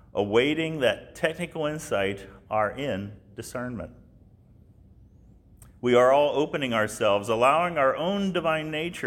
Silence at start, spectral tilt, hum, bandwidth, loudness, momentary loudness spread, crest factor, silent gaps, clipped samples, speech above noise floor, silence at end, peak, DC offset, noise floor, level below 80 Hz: 0.15 s; -5 dB/octave; none; 17 kHz; -25 LUFS; 14 LU; 18 dB; none; under 0.1%; 29 dB; 0 s; -8 dBFS; under 0.1%; -54 dBFS; -56 dBFS